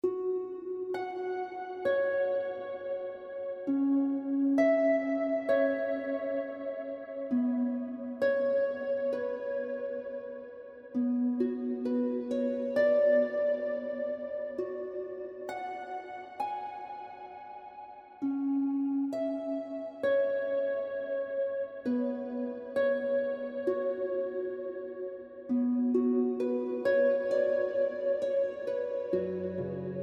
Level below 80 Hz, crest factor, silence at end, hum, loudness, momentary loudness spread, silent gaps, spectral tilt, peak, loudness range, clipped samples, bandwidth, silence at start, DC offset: -76 dBFS; 16 dB; 0 s; none; -32 LUFS; 12 LU; none; -7.5 dB/octave; -16 dBFS; 6 LU; under 0.1%; 6.4 kHz; 0.05 s; under 0.1%